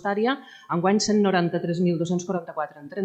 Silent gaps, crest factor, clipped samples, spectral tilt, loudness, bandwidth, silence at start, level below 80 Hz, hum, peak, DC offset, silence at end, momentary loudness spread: none; 16 dB; under 0.1%; -5.5 dB/octave; -24 LUFS; 9 kHz; 0.05 s; -64 dBFS; none; -8 dBFS; under 0.1%; 0 s; 11 LU